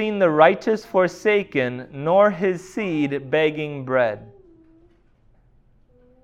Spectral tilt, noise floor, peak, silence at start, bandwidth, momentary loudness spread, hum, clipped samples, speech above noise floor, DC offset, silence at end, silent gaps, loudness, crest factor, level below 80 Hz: -6.5 dB/octave; -56 dBFS; -2 dBFS; 0 s; 10.5 kHz; 11 LU; none; under 0.1%; 36 dB; under 0.1%; 1.95 s; none; -20 LUFS; 20 dB; -58 dBFS